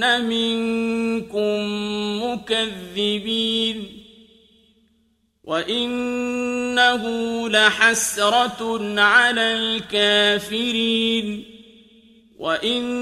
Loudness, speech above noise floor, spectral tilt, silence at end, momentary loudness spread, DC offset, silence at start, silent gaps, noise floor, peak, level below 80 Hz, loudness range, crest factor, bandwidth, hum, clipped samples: -20 LUFS; 44 dB; -2.5 dB/octave; 0 s; 10 LU; under 0.1%; 0 s; none; -65 dBFS; 0 dBFS; -58 dBFS; 8 LU; 20 dB; 15.5 kHz; none; under 0.1%